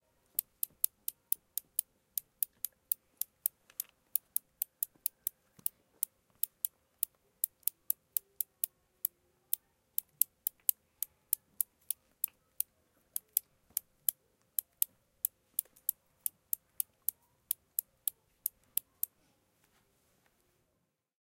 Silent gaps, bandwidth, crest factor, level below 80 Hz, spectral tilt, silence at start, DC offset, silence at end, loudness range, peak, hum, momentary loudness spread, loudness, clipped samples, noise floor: none; 17 kHz; 38 dB; -84 dBFS; 2 dB/octave; 1.1 s; under 0.1%; 2.8 s; 3 LU; -4 dBFS; none; 7 LU; -37 LUFS; under 0.1%; -81 dBFS